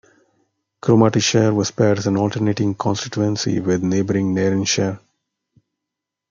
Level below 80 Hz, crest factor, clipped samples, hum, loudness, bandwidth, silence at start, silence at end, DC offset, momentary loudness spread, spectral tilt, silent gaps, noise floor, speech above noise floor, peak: -60 dBFS; 18 dB; under 0.1%; none; -18 LUFS; 7.6 kHz; 0.85 s; 1.35 s; under 0.1%; 6 LU; -5.5 dB/octave; none; -83 dBFS; 65 dB; -2 dBFS